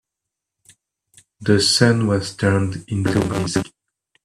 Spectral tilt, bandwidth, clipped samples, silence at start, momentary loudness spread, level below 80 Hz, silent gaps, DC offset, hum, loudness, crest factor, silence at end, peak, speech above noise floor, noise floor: -5 dB/octave; 13 kHz; under 0.1%; 1.4 s; 10 LU; -50 dBFS; none; under 0.1%; none; -19 LUFS; 20 dB; 0.6 s; 0 dBFS; 65 dB; -83 dBFS